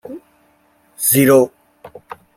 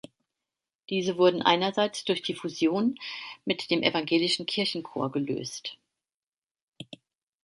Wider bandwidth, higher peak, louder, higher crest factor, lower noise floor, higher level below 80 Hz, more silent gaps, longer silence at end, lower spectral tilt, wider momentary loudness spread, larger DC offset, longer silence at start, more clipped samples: first, 16.5 kHz vs 11.5 kHz; first, 0 dBFS vs -6 dBFS; first, -13 LUFS vs -27 LUFS; second, 18 dB vs 24 dB; second, -56 dBFS vs under -90 dBFS; first, -58 dBFS vs -74 dBFS; second, none vs 6.17-6.21 s, 6.27-6.31 s, 6.37-6.42 s, 6.64-6.72 s; about the same, 0.5 s vs 0.5 s; about the same, -4.5 dB/octave vs -4.5 dB/octave; first, 26 LU vs 14 LU; neither; second, 0.1 s vs 0.9 s; neither